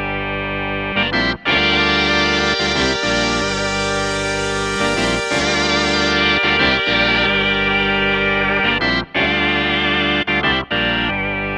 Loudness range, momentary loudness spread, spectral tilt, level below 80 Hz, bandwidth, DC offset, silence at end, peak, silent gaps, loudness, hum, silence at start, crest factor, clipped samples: 3 LU; 5 LU; -3.5 dB/octave; -34 dBFS; 12 kHz; under 0.1%; 0 s; -2 dBFS; none; -16 LUFS; none; 0 s; 16 dB; under 0.1%